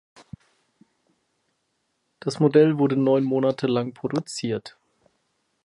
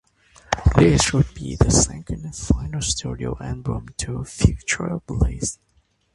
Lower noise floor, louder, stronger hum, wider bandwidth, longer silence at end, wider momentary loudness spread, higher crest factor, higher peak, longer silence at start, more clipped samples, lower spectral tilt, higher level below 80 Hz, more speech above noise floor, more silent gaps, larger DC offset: first, -74 dBFS vs -52 dBFS; about the same, -22 LUFS vs -22 LUFS; neither; about the same, 11.5 kHz vs 11.5 kHz; first, 0.95 s vs 0.6 s; about the same, 13 LU vs 13 LU; about the same, 20 dB vs 22 dB; second, -6 dBFS vs 0 dBFS; first, 2.25 s vs 0.5 s; neither; first, -7 dB/octave vs -4.5 dB/octave; second, -68 dBFS vs -30 dBFS; first, 52 dB vs 31 dB; neither; neither